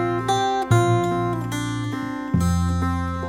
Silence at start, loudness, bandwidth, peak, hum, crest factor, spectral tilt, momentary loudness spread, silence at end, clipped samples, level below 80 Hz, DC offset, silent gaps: 0 s; -22 LUFS; 15 kHz; -4 dBFS; none; 16 dB; -6 dB/octave; 8 LU; 0 s; under 0.1%; -38 dBFS; under 0.1%; none